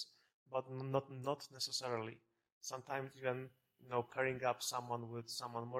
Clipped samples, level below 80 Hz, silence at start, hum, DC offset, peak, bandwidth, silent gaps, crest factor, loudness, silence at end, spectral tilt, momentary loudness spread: under 0.1%; -82 dBFS; 0 s; none; under 0.1%; -22 dBFS; 16 kHz; 0.34-0.46 s, 2.52-2.61 s; 22 dB; -43 LUFS; 0 s; -4 dB/octave; 10 LU